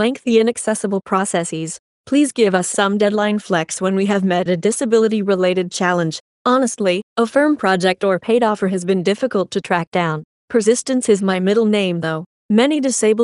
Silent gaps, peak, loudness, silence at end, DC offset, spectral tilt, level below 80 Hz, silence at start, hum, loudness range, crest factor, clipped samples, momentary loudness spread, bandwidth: 1.79-2.04 s, 6.20-6.45 s, 7.03-7.16 s, 9.87-9.92 s, 10.24-10.48 s, 12.26-12.49 s; 0 dBFS; -17 LUFS; 0 s; under 0.1%; -4.5 dB/octave; -64 dBFS; 0 s; none; 1 LU; 16 dB; under 0.1%; 5 LU; 11.5 kHz